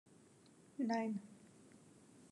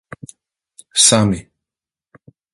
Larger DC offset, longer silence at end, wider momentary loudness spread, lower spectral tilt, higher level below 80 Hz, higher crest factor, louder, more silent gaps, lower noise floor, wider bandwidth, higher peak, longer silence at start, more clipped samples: neither; second, 0.05 s vs 1.15 s; about the same, 26 LU vs 26 LU; first, -6 dB/octave vs -3 dB/octave; second, under -90 dBFS vs -46 dBFS; about the same, 18 dB vs 20 dB; second, -42 LUFS vs -13 LUFS; neither; second, -66 dBFS vs -88 dBFS; second, 11.5 kHz vs 14.5 kHz; second, -28 dBFS vs 0 dBFS; second, 0.8 s vs 0.95 s; neither